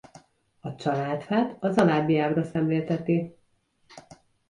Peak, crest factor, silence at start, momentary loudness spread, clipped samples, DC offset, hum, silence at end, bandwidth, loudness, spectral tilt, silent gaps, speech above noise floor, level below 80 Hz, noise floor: -8 dBFS; 18 dB; 0.65 s; 11 LU; under 0.1%; under 0.1%; none; 0.5 s; 11.5 kHz; -25 LUFS; -8 dB/octave; none; 43 dB; -64 dBFS; -68 dBFS